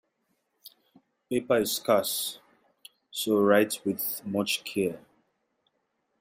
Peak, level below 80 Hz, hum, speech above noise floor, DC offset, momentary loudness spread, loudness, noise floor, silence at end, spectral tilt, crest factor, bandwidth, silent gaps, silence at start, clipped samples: -8 dBFS; -72 dBFS; none; 50 dB; under 0.1%; 11 LU; -27 LUFS; -77 dBFS; 1.2 s; -3.5 dB/octave; 20 dB; 16 kHz; none; 0.65 s; under 0.1%